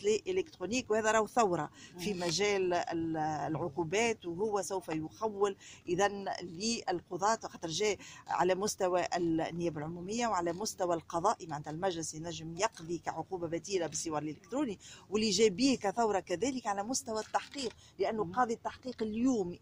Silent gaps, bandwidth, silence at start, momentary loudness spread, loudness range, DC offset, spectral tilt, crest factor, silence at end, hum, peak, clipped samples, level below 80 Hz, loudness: none; 16 kHz; 0 s; 9 LU; 3 LU; under 0.1%; -4 dB/octave; 18 dB; 0.05 s; none; -16 dBFS; under 0.1%; -64 dBFS; -34 LUFS